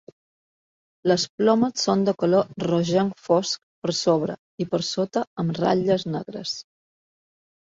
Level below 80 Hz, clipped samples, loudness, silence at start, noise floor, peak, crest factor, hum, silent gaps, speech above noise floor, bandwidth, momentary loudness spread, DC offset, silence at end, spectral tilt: -64 dBFS; under 0.1%; -23 LUFS; 1.05 s; under -90 dBFS; -6 dBFS; 18 dB; none; 1.29-1.38 s, 3.63-3.82 s, 4.39-4.58 s, 5.27-5.36 s; over 67 dB; 7.8 kHz; 10 LU; under 0.1%; 1.15 s; -5.5 dB/octave